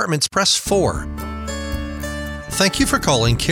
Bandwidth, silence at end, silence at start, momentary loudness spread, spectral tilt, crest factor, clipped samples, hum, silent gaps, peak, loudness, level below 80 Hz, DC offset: 17.5 kHz; 0 s; 0 s; 11 LU; -3.5 dB/octave; 18 dB; under 0.1%; none; none; -2 dBFS; -19 LUFS; -32 dBFS; under 0.1%